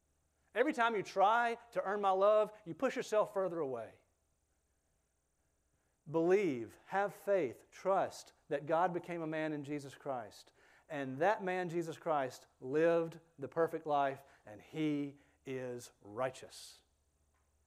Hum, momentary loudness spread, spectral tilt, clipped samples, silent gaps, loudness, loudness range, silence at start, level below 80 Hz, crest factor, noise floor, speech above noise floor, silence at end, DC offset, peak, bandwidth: none; 17 LU; -5.5 dB/octave; under 0.1%; none; -36 LUFS; 7 LU; 0.55 s; -80 dBFS; 20 dB; -80 dBFS; 44 dB; 0.95 s; under 0.1%; -18 dBFS; 15 kHz